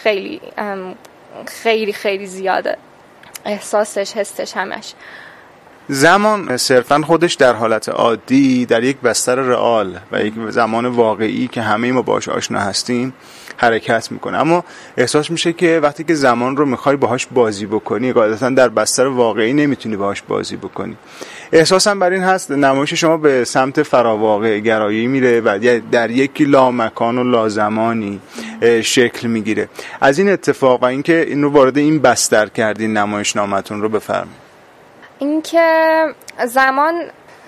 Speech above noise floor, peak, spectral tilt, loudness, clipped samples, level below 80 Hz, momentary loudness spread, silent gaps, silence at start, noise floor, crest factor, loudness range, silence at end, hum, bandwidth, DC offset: 29 dB; 0 dBFS; -4 dB/octave; -15 LUFS; under 0.1%; -56 dBFS; 12 LU; none; 0 s; -44 dBFS; 16 dB; 5 LU; 0.35 s; none; 14.5 kHz; under 0.1%